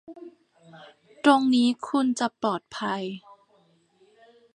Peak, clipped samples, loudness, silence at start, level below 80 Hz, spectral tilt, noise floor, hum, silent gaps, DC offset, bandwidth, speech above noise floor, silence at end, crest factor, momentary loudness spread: -4 dBFS; under 0.1%; -24 LUFS; 0.1 s; -76 dBFS; -4.5 dB/octave; -63 dBFS; none; none; under 0.1%; 11 kHz; 40 dB; 1.4 s; 24 dB; 20 LU